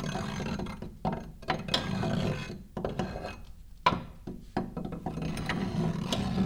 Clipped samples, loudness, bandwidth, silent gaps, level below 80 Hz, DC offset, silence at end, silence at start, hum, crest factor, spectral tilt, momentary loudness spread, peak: under 0.1%; -34 LUFS; 16.5 kHz; none; -46 dBFS; under 0.1%; 0 s; 0 s; none; 24 dB; -5.5 dB/octave; 11 LU; -10 dBFS